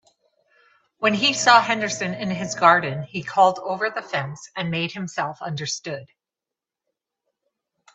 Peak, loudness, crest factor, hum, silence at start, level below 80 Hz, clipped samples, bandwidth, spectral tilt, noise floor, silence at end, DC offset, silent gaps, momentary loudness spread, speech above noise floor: 0 dBFS; -21 LUFS; 24 dB; none; 1 s; -68 dBFS; under 0.1%; 8.4 kHz; -3.5 dB/octave; -88 dBFS; 1.9 s; under 0.1%; none; 13 LU; 66 dB